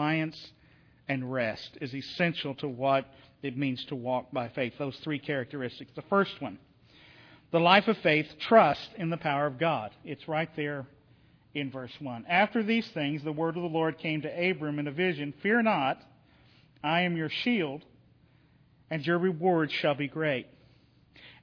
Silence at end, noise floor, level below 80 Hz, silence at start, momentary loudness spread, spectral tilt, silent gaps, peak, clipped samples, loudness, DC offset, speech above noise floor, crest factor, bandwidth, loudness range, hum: 0.1 s; -62 dBFS; -70 dBFS; 0 s; 14 LU; -7.5 dB/octave; none; -6 dBFS; under 0.1%; -29 LUFS; under 0.1%; 33 dB; 24 dB; 5.4 kHz; 7 LU; none